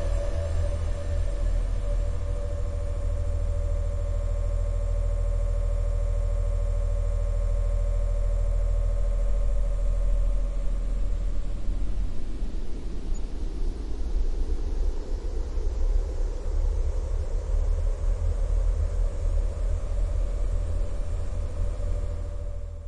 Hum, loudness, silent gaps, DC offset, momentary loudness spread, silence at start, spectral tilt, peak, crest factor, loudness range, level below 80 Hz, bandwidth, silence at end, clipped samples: none; -31 LUFS; none; under 0.1%; 6 LU; 0 s; -7 dB/octave; -14 dBFS; 12 dB; 5 LU; -26 dBFS; 9 kHz; 0 s; under 0.1%